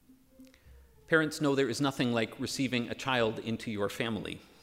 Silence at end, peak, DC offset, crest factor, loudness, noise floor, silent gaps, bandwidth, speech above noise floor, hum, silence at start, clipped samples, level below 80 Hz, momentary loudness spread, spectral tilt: 0.2 s; -10 dBFS; under 0.1%; 22 dB; -31 LUFS; -58 dBFS; none; 16 kHz; 27 dB; none; 0.1 s; under 0.1%; -64 dBFS; 7 LU; -5 dB/octave